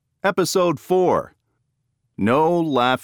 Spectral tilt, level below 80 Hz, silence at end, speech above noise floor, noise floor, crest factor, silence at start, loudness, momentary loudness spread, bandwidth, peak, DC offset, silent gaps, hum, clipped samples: -5 dB/octave; -60 dBFS; 0.05 s; 53 dB; -72 dBFS; 16 dB; 0.25 s; -19 LUFS; 5 LU; over 20 kHz; -4 dBFS; under 0.1%; none; none; under 0.1%